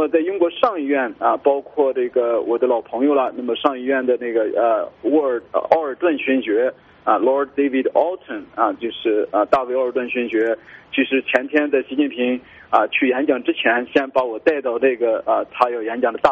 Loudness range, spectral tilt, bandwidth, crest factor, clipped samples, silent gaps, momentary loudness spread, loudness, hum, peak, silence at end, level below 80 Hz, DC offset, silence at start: 1 LU; -1.5 dB/octave; 7.4 kHz; 18 dB; under 0.1%; none; 4 LU; -19 LUFS; none; 0 dBFS; 0 s; -62 dBFS; under 0.1%; 0 s